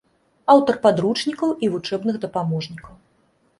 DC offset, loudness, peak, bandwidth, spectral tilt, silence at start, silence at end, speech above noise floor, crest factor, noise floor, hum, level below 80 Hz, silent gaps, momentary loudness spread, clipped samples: under 0.1%; -20 LUFS; -2 dBFS; 11.5 kHz; -6.5 dB/octave; 0.5 s; 0.7 s; 43 dB; 20 dB; -62 dBFS; none; -58 dBFS; none; 12 LU; under 0.1%